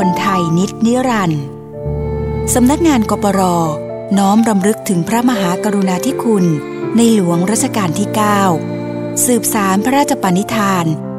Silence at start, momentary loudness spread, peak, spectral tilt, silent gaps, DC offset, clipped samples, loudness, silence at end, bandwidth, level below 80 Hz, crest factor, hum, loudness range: 0 s; 8 LU; 0 dBFS; -5 dB/octave; none; 0.2%; under 0.1%; -14 LUFS; 0 s; 16.5 kHz; -36 dBFS; 14 dB; none; 1 LU